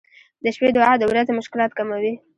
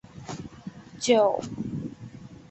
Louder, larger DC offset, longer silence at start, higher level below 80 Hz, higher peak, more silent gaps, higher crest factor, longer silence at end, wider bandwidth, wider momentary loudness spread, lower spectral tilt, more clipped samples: first, -20 LUFS vs -26 LUFS; neither; first, 0.45 s vs 0.15 s; about the same, -60 dBFS vs -58 dBFS; first, -2 dBFS vs -8 dBFS; neither; about the same, 18 dB vs 22 dB; about the same, 0.2 s vs 0.1 s; first, 10.5 kHz vs 8.6 kHz; second, 9 LU vs 22 LU; about the same, -5.5 dB/octave vs -4.5 dB/octave; neither